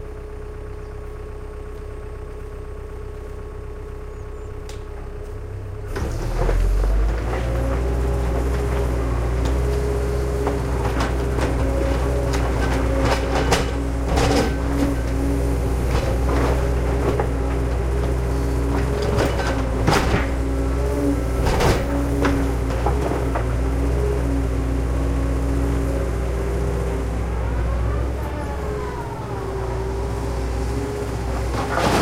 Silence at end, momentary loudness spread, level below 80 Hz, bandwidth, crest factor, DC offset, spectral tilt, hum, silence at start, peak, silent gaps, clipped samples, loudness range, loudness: 0 s; 14 LU; -24 dBFS; 15 kHz; 18 dB; under 0.1%; -6.5 dB/octave; none; 0 s; -4 dBFS; none; under 0.1%; 13 LU; -22 LUFS